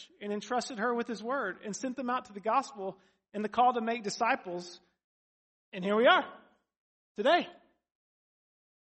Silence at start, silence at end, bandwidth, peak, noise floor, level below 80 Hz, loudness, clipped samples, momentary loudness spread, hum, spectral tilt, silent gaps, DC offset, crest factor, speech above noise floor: 0 s; 1.25 s; 8.4 kHz; -8 dBFS; under -90 dBFS; -80 dBFS; -31 LUFS; under 0.1%; 16 LU; none; -4 dB/octave; 5.04-5.72 s, 6.77-7.15 s; under 0.1%; 24 dB; over 59 dB